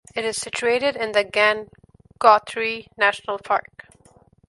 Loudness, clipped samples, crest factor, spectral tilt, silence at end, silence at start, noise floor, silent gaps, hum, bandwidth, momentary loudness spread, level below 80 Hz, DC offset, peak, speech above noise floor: -21 LUFS; under 0.1%; 22 dB; -2 dB/octave; 0.9 s; 0.15 s; -55 dBFS; none; none; 11.5 kHz; 10 LU; -62 dBFS; under 0.1%; 0 dBFS; 34 dB